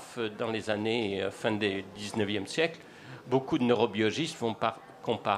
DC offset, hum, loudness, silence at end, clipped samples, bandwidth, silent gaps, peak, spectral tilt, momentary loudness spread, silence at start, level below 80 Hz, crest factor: under 0.1%; none; -31 LUFS; 0 s; under 0.1%; 13.5 kHz; none; -10 dBFS; -5 dB/octave; 9 LU; 0 s; -70 dBFS; 20 dB